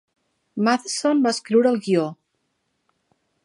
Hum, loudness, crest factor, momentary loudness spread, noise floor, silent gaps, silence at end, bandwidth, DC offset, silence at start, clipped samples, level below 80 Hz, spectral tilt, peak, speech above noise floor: none; -21 LUFS; 18 dB; 7 LU; -73 dBFS; none; 1.3 s; 11 kHz; under 0.1%; 0.55 s; under 0.1%; -78 dBFS; -4.5 dB/octave; -4 dBFS; 53 dB